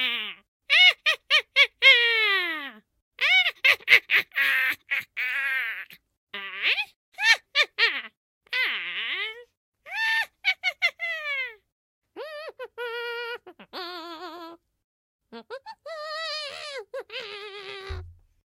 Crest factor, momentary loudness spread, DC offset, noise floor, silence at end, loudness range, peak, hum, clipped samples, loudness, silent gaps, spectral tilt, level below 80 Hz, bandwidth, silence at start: 26 dB; 22 LU; under 0.1%; -44 dBFS; 0.3 s; 17 LU; -2 dBFS; none; under 0.1%; -22 LUFS; 0.48-0.60 s, 3.02-3.11 s, 6.17-6.27 s, 6.96-7.12 s, 8.17-8.41 s, 9.57-9.72 s, 11.72-12.02 s, 14.84-15.19 s; -0.5 dB/octave; -58 dBFS; 16 kHz; 0 s